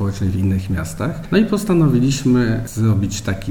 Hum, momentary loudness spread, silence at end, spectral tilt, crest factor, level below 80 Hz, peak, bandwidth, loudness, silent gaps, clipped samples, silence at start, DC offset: none; 8 LU; 0 s; -6.5 dB/octave; 14 dB; -34 dBFS; -2 dBFS; 18.5 kHz; -18 LUFS; none; under 0.1%; 0 s; under 0.1%